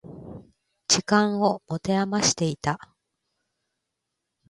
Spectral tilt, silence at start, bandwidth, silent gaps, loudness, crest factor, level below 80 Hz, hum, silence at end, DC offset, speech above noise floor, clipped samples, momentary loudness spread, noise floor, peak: -3.5 dB/octave; 0.05 s; 11.5 kHz; none; -23 LUFS; 22 dB; -58 dBFS; none; 1.75 s; under 0.1%; 58 dB; under 0.1%; 19 LU; -82 dBFS; -6 dBFS